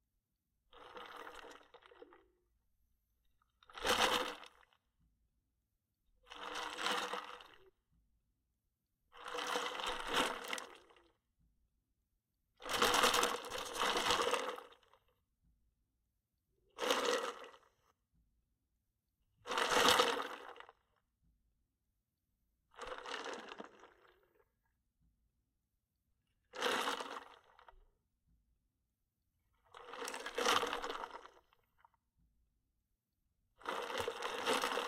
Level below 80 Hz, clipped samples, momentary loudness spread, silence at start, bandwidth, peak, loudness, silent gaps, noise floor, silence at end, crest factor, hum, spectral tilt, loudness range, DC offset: -68 dBFS; under 0.1%; 22 LU; 0.75 s; 16 kHz; -14 dBFS; -37 LUFS; none; -87 dBFS; 0 s; 30 dB; none; -1 dB/octave; 15 LU; under 0.1%